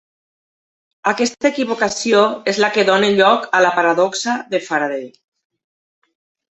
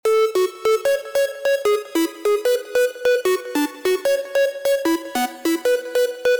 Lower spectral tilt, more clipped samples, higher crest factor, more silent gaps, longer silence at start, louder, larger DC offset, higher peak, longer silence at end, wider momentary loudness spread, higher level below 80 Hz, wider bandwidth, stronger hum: first, -3.5 dB/octave vs -2 dB/octave; neither; first, 16 dB vs 8 dB; neither; first, 1.05 s vs 0.05 s; first, -16 LUFS vs -20 LUFS; neither; first, -2 dBFS vs -12 dBFS; first, 1.5 s vs 0 s; first, 8 LU vs 3 LU; about the same, -62 dBFS vs -64 dBFS; second, 8.2 kHz vs over 20 kHz; neither